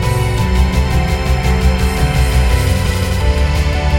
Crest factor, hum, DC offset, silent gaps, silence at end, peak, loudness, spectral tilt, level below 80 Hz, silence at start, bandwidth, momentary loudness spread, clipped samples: 10 dB; none; under 0.1%; none; 0 s; -2 dBFS; -15 LUFS; -5.5 dB/octave; -16 dBFS; 0 s; 16.5 kHz; 2 LU; under 0.1%